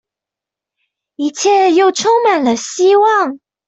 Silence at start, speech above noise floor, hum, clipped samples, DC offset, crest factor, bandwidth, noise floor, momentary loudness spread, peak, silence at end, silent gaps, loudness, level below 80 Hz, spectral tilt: 1.2 s; 74 dB; none; under 0.1%; under 0.1%; 12 dB; 8.2 kHz; -85 dBFS; 9 LU; -2 dBFS; 0.3 s; none; -12 LUFS; -64 dBFS; -2.5 dB/octave